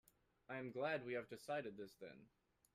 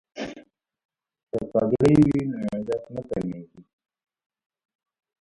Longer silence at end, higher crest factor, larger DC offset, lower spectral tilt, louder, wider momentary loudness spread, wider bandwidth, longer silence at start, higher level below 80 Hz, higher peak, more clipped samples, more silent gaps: second, 0.5 s vs 1.6 s; about the same, 18 dB vs 20 dB; neither; second, -5.5 dB/octave vs -8.5 dB/octave; second, -48 LUFS vs -24 LUFS; second, 15 LU vs 18 LU; first, 15.5 kHz vs 11.5 kHz; first, 0.5 s vs 0.15 s; second, -84 dBFS vs -52 dBFS; second, -32 dBFS vs -6 dBFS; neither; second, none vs 0.85-0.89 s, 1.23-1.27 s